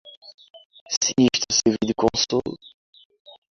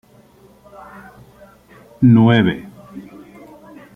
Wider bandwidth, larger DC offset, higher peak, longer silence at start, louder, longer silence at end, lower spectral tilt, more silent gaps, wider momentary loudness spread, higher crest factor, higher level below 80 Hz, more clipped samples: first, 7.6 kHz vs 3.8 kHz; neither; about the same, -4 dBFS vs -2 dBFS; second, 0.05 s vs 2 s; second, -21 LUFS vs -13 LUFS; about the same, 0.95 s vs 0.95 s; second, -3 dB/octave vs -9 dB/octave; first, 0.17-0.22 s, 0.34-0.38 s, 0.65-0.70 s, 0.81-0.86 s, 0.97-1.01 s vs none; second, 10 LU vs 28 LU; about the same, 20 dB vs 18 dB; about the same, -52 dBFS vs -52 dBFS; neither